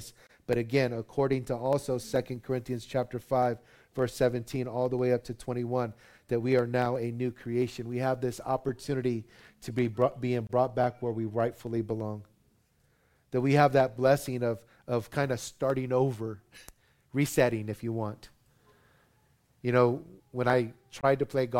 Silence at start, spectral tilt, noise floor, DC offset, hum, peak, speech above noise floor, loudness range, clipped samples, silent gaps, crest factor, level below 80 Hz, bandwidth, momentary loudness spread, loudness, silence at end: 0 s; -6.5 dB/octave; -69 dBFS; under 0.1%; none; -8 dBFS; 39 dB; 4 LU; under 0.1%; none; 22 dB; -58 dBFS; 16.5 kHz; 11 LU; -30 LUFS; 0 s